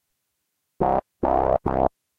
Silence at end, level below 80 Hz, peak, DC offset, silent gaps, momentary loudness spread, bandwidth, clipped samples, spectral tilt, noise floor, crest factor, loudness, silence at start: 0.3 s; -40 dBFS; -6 dBFS; under 0.1%; none; 3 LU; 5.2 kHz; under 0.1%; -10 dB/octave; -77 dBFS; 20 dB; -23 LUFS; 0.8 s